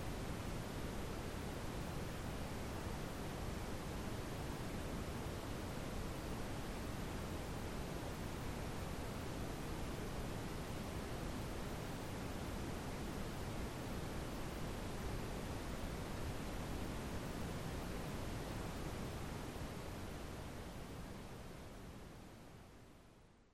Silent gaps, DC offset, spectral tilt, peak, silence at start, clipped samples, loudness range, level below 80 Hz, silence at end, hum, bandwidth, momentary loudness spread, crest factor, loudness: none; under 0.1%; -5.5 dB/octave; -32 dBFS; 0 s; under 0.1%; 2 LU; -52 dBFS; 0.05 s; none; 16 kHz; 5 LU; 14 dB; -46 LUFS